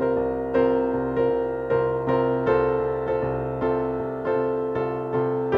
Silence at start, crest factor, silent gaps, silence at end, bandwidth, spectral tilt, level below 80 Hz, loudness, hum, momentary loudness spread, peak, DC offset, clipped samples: 0 s; 14 dB; none; 0 s; 4.8 kHz; -9.5 dB/octave; -46 dBFS; -24 LUFS; none; 4 LU; -10 dBFS; under 0.1%; under 0.1%